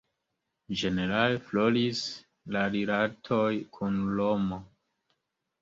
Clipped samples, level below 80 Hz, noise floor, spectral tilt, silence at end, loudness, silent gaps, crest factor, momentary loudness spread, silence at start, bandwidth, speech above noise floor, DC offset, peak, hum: under 0.1%; -60 dBFS; -83 dBFS; -6 dB/octave; 0.95 s; -29 LUFS; none; 20 dB; 8 LU; 0.7 s; 7.8 kHz; 54 dB; under 0.1%; -10 dBFS; none